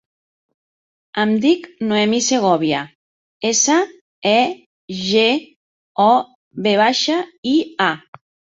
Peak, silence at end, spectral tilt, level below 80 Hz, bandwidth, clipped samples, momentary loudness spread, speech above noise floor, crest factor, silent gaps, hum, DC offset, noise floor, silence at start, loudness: -2 dBFS; 0.55 s; -3 dB/octave; -64 dBFS; 8 kHz; under 0.1%; 13 LU; over 73 dB; 18 dB; 2.95-3.40 s, 4.01-4.22 s, 4.66-4.88 s, 5.56-5.95 s, 6.35-6.51 s, 7.38-7.43 s; none; under 0.1%; under -90 dBFS; 1.15 s; -17 LUFS